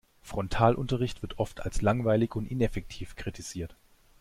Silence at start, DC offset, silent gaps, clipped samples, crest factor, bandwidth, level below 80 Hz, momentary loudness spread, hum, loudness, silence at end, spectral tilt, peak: 0.25 s; under 0.1%; none; under 0.1%; 20 dB; 15 kHz; -42 dBFS; 14 LU; none; -30 LUFS; 0.5 s; -6.5 dB/octave; -8 dBFS